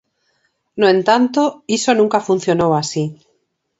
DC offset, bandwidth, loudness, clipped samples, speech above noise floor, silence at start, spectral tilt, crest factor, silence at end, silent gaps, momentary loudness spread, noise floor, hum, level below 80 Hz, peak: under 0.1%; 8.2 kHz; -16 LUFS; under 0.1%; 51 dB; 0.75 s; -5 dB/octave; 16 dB; 0.65 s; none; 9 LU; -66 dBFS; none; -58 dBFS; 0 dBFS